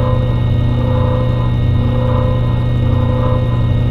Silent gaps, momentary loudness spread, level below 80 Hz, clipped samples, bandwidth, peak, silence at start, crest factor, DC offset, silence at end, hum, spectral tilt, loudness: none; 1 LU; -22 dBFS; under 0.1%; 4.5 kHz; -2 dBFS; 0 s; 10 dB; under 0.1%; 0 s; 60 Hz at -15 dBFS; -9.5 dB/octave; -15 LUFS